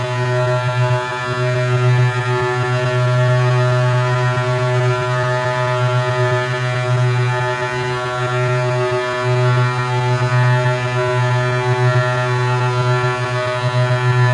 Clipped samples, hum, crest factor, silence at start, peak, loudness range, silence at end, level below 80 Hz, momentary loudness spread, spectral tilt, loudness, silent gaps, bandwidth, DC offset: under 0.1%; none; 12 dB; 0 s; -4 dBFS; 2 LU; 0 s; -50 dBFS; 4 LU; -6.5 dB/octave; -17 LUFS; none; 10.5 kHz; under 0.1%